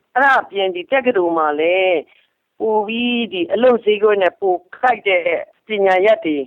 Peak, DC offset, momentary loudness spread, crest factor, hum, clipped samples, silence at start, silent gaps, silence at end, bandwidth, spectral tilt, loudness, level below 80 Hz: -4 dBFS; under 0.1%; 7 LU; 12 dB; none; under 0.1%; 0.15 s; none; 0 s; 7.2 kHz; -5.5 dB/octave; -16 LUFS; -64 dBFS